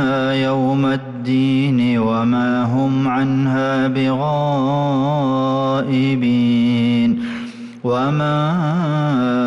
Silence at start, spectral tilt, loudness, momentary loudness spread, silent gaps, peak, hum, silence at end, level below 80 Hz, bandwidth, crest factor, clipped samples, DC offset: 0 s; -8 dB/octave; -17 LUFS; 4 LU; none; -8 dBFS; none; 0 s; -54 dBFS; 7.6 kHz; 8 dB; under 0.1%; under 0.1%